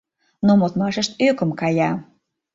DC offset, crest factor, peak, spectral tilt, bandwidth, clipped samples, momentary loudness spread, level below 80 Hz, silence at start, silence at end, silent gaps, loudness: under 0.1%; 16 dB; -4 dBFS; -6 dB/octave; 7.8 kHz; under 0.1%; 6 LU; -58 dBFS; 0.4 s; 0.5 s; none; -20 LUFS